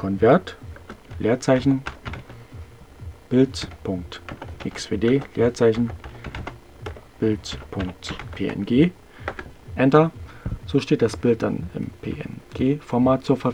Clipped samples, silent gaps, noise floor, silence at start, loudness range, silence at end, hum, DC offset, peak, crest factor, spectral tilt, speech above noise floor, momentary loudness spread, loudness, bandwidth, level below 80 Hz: under 0.1%; none; -41 dBFS; 0 s; 4 LU; 0 s; none; 0.2%; 0 dBFS; 22 dB; -7 dB/octave; 20 dB; 20 LU; -22 LUFS; 11.5 kHz; -44 dBFS